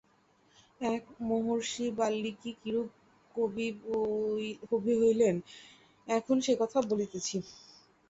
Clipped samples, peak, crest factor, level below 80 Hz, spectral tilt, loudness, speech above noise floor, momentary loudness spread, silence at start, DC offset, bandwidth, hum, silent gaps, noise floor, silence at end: under 0.1%; -16 dBFS; 16 dB; -70 dBFS; -5 dB/octave; -32 LUFS; 36 dB; 12 LU; 0.8 s; under 0.1%; 8 kHz; none; none; -67 dBFS; 0.55 s